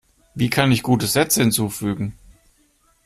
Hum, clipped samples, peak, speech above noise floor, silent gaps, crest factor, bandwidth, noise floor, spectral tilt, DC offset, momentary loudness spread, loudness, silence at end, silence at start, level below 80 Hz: none; under 0.1%; -4 dBFS; 41 dB; none; 18 dB; 15.5 kHz; -60 dBFS; -4.5 dB/octave; under 0.1%; 11 LU; -19 LUFS; 0.95 s; 0.35 s; -48 dBFS